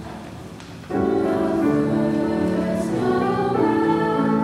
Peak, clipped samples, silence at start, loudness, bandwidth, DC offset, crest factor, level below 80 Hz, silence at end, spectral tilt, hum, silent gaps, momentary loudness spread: -8 dBFS; under 0.1%; 0 s; -21 LUFS; 13 kHz; under 0.1%; 14 dB; -48 dBFS; 0 s; -7.5 dB/octave; none; none; 16 LU